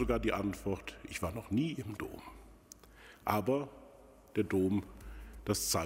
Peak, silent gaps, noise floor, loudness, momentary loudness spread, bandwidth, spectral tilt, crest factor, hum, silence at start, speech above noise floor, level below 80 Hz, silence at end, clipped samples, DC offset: -12 dBFS; none; -58 dBFS; -36 LUFS; 22 LU; 16 kHz; -5 dB/octave; 24 dB; none; 0 s; 23 dB; -52 dBFS; 0 s; under 0.1%; under 0.1%